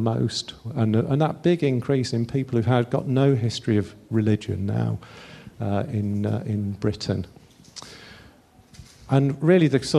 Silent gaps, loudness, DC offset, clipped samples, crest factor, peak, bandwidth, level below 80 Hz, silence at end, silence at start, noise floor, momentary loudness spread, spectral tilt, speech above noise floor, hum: none; -24 LUFS; under 0.1%; under 0.1%; 18 dB; -4 dBFS; 12 kHz; -54 dBFS; 0 s; 0 s; -52 dBFS; 19 LU; -7 dB/octave; 30 dB; none